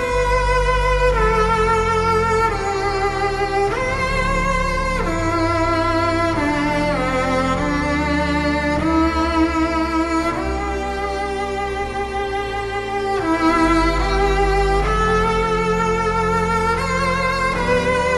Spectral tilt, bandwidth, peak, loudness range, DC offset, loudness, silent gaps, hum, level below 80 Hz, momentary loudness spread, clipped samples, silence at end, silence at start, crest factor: -5.5 dB/octave; 12 kHz; -4 dBFS; 3 LU; under 0.1%; -19 LUFS; none; none; -28 dBFS; 6 LU; under 0.1%; 0 s; 0 s; 14 dB